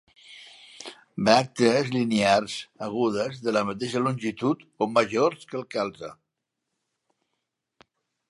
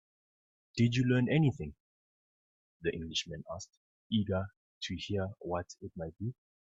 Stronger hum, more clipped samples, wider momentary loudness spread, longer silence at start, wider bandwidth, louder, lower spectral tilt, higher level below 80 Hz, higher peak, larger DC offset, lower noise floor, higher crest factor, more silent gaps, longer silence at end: neither; neither; first, 21 LU vs 16 LU; second, 0.3 s vs 0.75 s; first, 11.5 kHz vs 7.8 kHz; first, -25 LUFS vs -34 LUFS; about the same, -5 dB/octave vs -6 dB/octave; about the same, -66 dBFS vs -62 dBFS; first, -2 dBFS vs -16 dBFS; neither; second, -83 dBFS vs under -90 dBFS; about the same, 24 dB vs 20 dB; second, none vs 1.80-2.80 s, 3.77-4.10 s, 4.57-4.81 s; first, 2.15 s vs 0.4 s